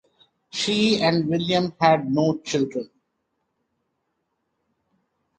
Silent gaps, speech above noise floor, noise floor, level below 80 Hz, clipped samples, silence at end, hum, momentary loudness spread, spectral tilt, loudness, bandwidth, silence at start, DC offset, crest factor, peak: none; 54 dB; -75 dBFS; -60 dBFS; under 0.1%; 2.55 s; none; 11 LU; -5 dB/octave; -21 LUFS; 9.4 kHz; 0.55 s; under 0.1%; 20 dB; -4 dBFS